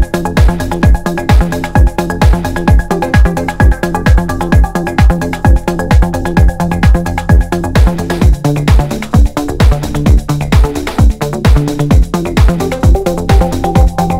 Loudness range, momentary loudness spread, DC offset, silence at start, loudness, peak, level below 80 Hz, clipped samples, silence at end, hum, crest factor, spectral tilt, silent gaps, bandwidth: 0 LU; 2 LU; under 0.1%; 0 s; -11 LUFS; 0 dBFS; -12 dBFS; 2%; 0 s; none; 10 dB; -7 dB/octave; none; 16 kHz